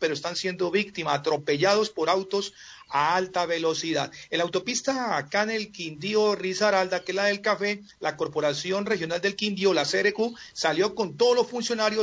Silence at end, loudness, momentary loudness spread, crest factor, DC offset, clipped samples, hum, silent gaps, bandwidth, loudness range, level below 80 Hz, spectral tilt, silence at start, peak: 0 s; -26 LUFS; 7 LU; 16 dB; under 0.1%; under 0.1%; none; none; 7.8 kHz; 2 LU; -68 dBFS; -3.5 dB/octave; 0 s; -10 dBFS